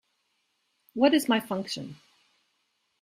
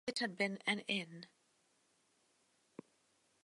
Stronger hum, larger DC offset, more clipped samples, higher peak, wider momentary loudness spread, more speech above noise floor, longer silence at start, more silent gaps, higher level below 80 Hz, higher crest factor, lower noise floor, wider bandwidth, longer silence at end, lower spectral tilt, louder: neither; neither; neither; first, -8 dBFS vs -20 dBFS; second, 17 LU vs 22 LU; first, 49 dB vs 37 dB; first, 0.95 s vs 0.05 s; neither; first, -72 dBFS vs -90 dBFS; about the same, 22 dB vs 24 dB; about the same, -75 dBFS vs -77 dBFS; first, 15.5 kHz vs 11.5 kHz; second, 1.1 s vs 2.2 s; about the same, -4.5 dB/octave vs -3.5 dB/octave; first, -26 LUFS vs -38 LUFS